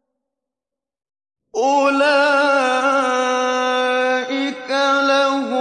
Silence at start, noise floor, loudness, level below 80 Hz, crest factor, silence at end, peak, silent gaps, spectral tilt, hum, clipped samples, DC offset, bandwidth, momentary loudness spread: 1.55 s; -87 dBFS; -17 LUFS; -76 dBFS; 14 dB; 0 s; -6 dBFS; none; -1.5 dB/octave; none; under 0.1%; under 0.1%; 10 kHz; 7 LU